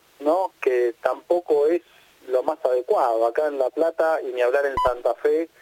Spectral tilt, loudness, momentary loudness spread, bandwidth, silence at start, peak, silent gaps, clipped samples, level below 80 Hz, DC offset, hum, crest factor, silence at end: -5 dB/octave; -22 LUFS; 4 LU; 17 kHz; 0.2 s; -4 dBFS; none; under 0.1%; -50 dBFS; under 0.1%; none; 18 dB; 0.15 s